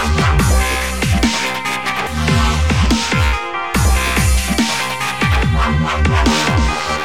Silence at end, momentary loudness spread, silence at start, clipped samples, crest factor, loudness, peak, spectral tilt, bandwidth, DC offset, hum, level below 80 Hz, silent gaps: 0 s; 4 LU; 0 s; under 0.1%; 12 dB; -15 LUFS; -2 dBFS; -4.5 dB/octave; 16 kHz; 1%; none; -20 dBFS; none